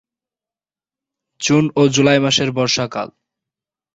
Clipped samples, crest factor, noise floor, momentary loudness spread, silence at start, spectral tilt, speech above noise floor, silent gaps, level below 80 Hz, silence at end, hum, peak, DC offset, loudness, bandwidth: under 0.1%; 16 dB; under -90 dBFS; 11 LU; 1.4 s; -4.5 dB/octave; over 75 dB; none; -56 dBFS; 0.9 s; none; -2 dBFS; under 0.1%; -15 LUFS; 8 kHz